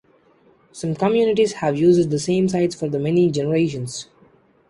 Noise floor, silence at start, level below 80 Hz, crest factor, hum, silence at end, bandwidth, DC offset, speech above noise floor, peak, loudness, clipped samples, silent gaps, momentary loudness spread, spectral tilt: -56 dBFS; 0.75 s; -56 dBFS; 16 dB; none; 0.65 s; 11.5 kHz; under 0.1%; 37 dB; -4 dBFS; -20 LUFS; under 0.1%; none; 12 LU; -6.5 dB/octave